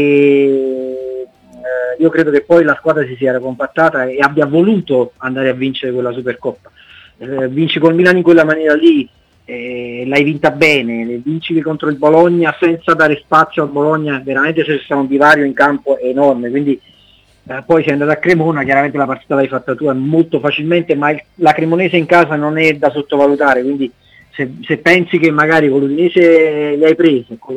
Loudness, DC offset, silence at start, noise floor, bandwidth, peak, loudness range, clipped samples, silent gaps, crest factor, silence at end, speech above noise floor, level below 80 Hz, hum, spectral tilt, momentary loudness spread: -12 LUFS; under 0.1%; 0 s; -48 dBFS; 10.5 kHz; 0 dBFS; 3 LU; 0.2%; none; 12 dB; 0 s; 36 dB; -54 dBFS; none; -7 dB/octave; 12 LU